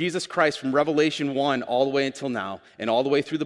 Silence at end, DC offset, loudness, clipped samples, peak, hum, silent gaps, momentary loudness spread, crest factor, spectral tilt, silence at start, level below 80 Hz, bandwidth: 0 s; under 0.1%; -24 LUFS; under 0.1%; -6 dBFS; none; none; 8 LU; 18 dB; -5 dB/octave; 0 s; -70 dBFS; 11.5 kHz